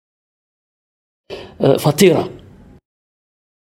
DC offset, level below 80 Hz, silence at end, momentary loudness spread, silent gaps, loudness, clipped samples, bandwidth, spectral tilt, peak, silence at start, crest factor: under 0.1%; -54 dBFS; 1.35 s; 22 LU; none; -14 LUFS; under 0.1%; 16.5 kHz; -5.5 dB/octave; 0 dBFS; 1.3 s; 20 dB